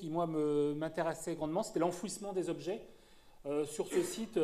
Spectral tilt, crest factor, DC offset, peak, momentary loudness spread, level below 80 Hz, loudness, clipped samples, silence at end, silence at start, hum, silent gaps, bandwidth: -5.5 dB/octave; 16 dB; under 0.1%; -20 dBFS; 7 LU; -66 dBFS; -37 LUFS; under 0.1%; 0 s; 0 s; none; none; 14.5 kHz